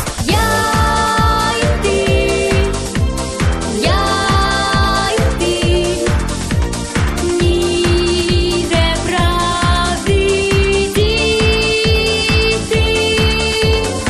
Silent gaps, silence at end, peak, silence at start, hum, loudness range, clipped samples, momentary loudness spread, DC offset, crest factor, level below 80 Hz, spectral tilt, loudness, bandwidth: none; 0 s; -2 dBFS; 0 s; none; 2 LU; under 0.1%; 5 LU; under 0.1%; 12 dB; -22 dBFS; -4.5 dB/octave; -14 LUFS; 14.5 kHz